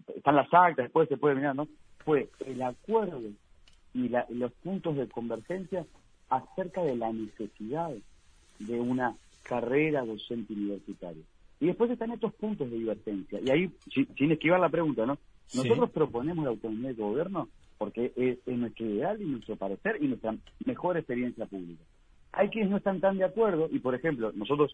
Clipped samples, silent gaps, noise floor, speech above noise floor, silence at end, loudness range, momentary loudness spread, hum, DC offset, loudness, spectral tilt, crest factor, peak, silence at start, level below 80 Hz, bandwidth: under 0.1%; none; -59 dBFS; 29 dB; 0 s; 6 LU; 12 LU; none; under 0.1%; -31 LUFS; -7.5 dB/octave; 22 dB; -8 dBFS; 0.1 s; -62 dBFS; 10.5 kHz